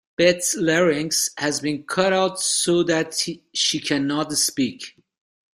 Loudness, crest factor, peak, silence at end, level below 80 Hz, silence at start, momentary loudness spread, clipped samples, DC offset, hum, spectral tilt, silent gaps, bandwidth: -21 LUFS; 18 dB; -4 dBFS; 0.7 s; -62 dBFS; 0.2 s; 7 LU; under 0.1%; under 0.1%; none; -3 dB/octave; none; 15.5 kHz